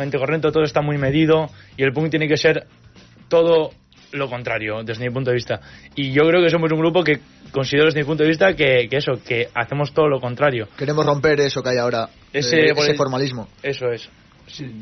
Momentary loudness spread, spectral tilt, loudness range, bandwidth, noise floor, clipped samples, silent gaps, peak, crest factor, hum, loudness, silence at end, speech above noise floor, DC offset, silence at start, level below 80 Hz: 11 LU; -4 dB/octave; 3 LU; 6.4 kHz; -47 dBFS; under 0.1%; none; -2 dBFS; 16 dB; none; -19 LUFS; 0 s; 28 dB; under 0.1%; 0 s; -52 dBFS